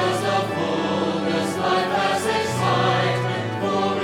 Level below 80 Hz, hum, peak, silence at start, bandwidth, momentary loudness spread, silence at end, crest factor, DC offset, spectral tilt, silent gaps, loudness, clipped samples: -62 dBFS; none; -6 dBFS; 0 s; 17 kHz; 4 LU; 0 s; 14 dB; under 0.1%; -5 dB/octave; none; -22 LUFS; under 0.1%